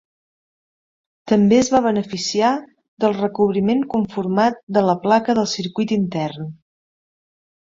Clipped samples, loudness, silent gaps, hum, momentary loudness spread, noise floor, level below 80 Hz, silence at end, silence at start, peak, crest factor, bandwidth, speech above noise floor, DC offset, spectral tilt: under 0.1%; -19 LUFS; 2.88-2.97 s, 4.63-4.67 s; none; 8 LU; under -90 dBFS; -58 dBFS; 1.25 s; 1.25 s; -2 dBFS; 18 dB; 7.8 kHz; over 72 dB; under 0.1%; -5.5 dB/octave